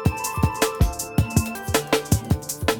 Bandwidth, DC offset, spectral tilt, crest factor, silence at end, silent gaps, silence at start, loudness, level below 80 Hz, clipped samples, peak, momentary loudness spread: 19 kHz; under 0.1%; -4.5 dB/octave; 18 dB; 0 s; none; 0 s; -23 LUFS; -30 dBFS; under 0.1%; -6 dBFS; 3 LU